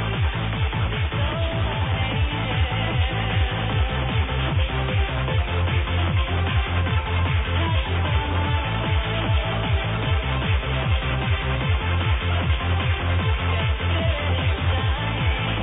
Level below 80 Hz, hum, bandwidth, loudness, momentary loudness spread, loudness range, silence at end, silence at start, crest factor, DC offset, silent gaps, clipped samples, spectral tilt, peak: -28 dBFS; none; 4 kHz; -23 LUFS; 1 LU; 1 LU; 0 s; 0 s; 12 dB; 0.2%; none; under 0.1%; -9.5 dB/octave; -10 dBFS